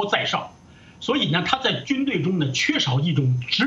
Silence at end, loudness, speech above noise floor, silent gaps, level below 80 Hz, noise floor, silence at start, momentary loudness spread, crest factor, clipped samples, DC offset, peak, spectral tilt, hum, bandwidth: 0 s; -22 LUFS; 26 dB; none; -58 dBFS; -48 dBFS; 0 s; 5 LU; 18 dB; under 0.1%; under 0.1%; -4 dBFS; -5 dB/octave; none; 7.8 kHz